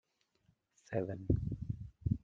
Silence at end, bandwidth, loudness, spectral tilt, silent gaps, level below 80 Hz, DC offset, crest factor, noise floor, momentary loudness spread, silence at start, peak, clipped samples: 0.05 s; 7.4 kHz; -39 LUFS; -10 dB/octave; none; -50 dBFS; under 0.1%; 22 dB; -76 dBFS; 7 LU; 0.9 s; -18 dBFS; under 0.1%